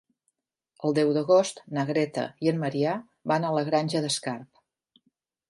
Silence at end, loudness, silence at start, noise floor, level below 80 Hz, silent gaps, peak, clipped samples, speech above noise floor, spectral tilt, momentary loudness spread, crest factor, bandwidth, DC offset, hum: 1.05 s; -26 LUFS; 0.8 s; -78 dBFS; -76 dBFS; none; -10 dBFS; under 0.1%; 53 dB; -5.5 dB/octave; 9 LU; 18 dB; 11.5 kHz; under 0.1%; none